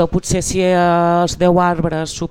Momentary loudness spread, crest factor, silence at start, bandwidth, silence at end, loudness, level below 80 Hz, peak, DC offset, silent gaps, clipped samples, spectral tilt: 6 LU; 14 dB; 0 s; 15 kHz; 0.05 s; -15 LUFS; -34 dBFS; 0 dBFS; under 0.1%; none; under 0.1%; -5.5 dB/octave